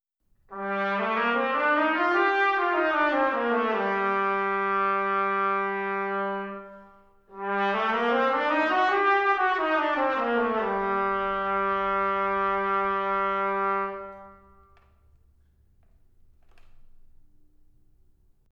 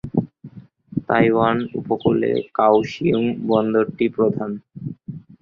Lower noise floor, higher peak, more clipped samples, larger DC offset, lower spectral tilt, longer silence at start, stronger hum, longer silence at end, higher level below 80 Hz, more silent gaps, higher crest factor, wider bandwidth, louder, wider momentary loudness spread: first, -65 dBFS vs -42 dBFS; second, -12 dBFS vs -2 dBFS; neither; neither; second, -6 dB/octave vs -8.5 dB/octave; first, 0.5 s vs 0.05 s; neither; first, 1.45 s vs 0.25 s; about the same, -58 dBFS vs -54 dBFS; neither; about the same, 16 dB vs 18 dB; about the same, 7.2 kHz vs 7 kHz; second, -25 LUFS vs -20 LUFS; second, 7 LU vs 16 LU